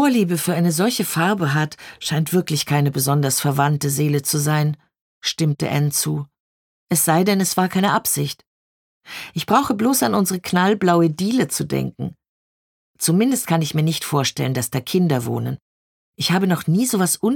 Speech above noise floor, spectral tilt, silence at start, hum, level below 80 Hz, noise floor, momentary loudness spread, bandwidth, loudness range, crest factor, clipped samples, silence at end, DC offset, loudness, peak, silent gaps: over 71 dB; -4.5 dB/octave; 0 s; none; -58 dBFS; under -90 dBFS; 10 LU; 19 kHz; 2 LU; 18 dB; under 0.1%; 0 s; under 0.1%; -19 LUFS; -2 dBFS; 5.01-5.21 s, 6.40-6.87 s, 8.47-9.01 s, 12.29-12.94 s, 15.62-16.13 s